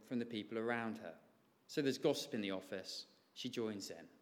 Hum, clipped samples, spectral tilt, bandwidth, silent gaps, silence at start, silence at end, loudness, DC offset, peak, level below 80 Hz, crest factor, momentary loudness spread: none; under 0.1%; -4.5 dB/octave; 17.5 kHz; none; 0 s; 0.15 s; -42 LUFS; under 0.1%; -24 dBFS; under -90 dBFS; 20 dB; 12 LU